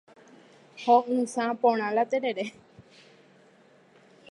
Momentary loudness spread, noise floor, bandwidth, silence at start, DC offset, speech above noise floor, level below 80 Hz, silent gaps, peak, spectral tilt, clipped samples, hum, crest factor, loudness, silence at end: 12 LU; -58 dBFS; 11.5 kHz; 0.75 s; under 0.1%; 33 dB; -80 dBFS; none; -8 dBFS; -4.5 dB/octave; under 0.1%; none; 20 dB; -26 LUFS; 1.5 s